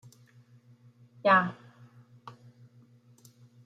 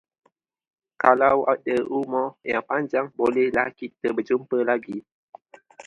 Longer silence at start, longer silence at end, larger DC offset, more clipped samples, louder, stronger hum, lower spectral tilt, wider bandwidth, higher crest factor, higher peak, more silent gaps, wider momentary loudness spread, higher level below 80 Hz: first, 1.25 s vs 1 s; first, 1.35 s vs 0.05 s; neither; neither; second, -26 LUFS vs -23 LUFS; neither; about the same, -6.5 dB/octave vs -7 dB/octave; first, 15 kHz vs 8.2 kHz; about the same, 24 dB vs 24 dB; second, -10 dBFS vs 0 dBFS; second, none vs 5.12-5.28 s; first, 28 LU vs 9 LU; second, -78 dBFS vs -64 dBFS